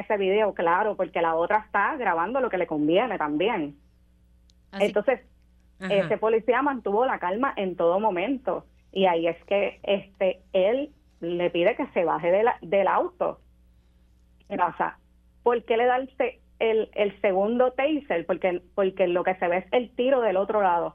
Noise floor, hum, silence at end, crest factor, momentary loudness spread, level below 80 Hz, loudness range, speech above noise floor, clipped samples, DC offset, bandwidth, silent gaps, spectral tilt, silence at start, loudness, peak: -59 dBFS; none; 0.05 s; 16 dB; 7 LU; -58 dBFS; 3 LU; 34 dB; under 0.1%; under 0.1%; 8.2 kHz; none; -7 dB/octave; 0 s; -25 LUFS; -8 dBFS